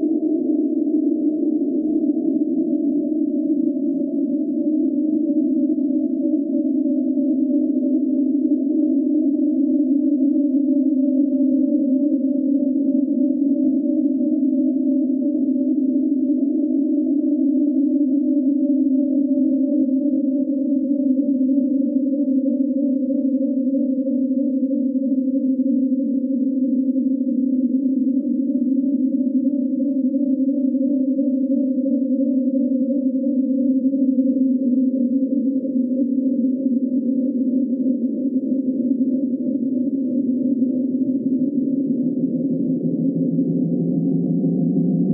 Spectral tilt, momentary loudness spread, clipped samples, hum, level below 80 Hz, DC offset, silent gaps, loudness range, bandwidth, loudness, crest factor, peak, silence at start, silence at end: -16.5 dB/octave; 3 LU; under 0.1%; none; -76 dBFS; under 0.1%; none; 2 LU; 0.8 kHz; -20 LUFS; 10 dB; -8 dBFS; 0 s; 0 s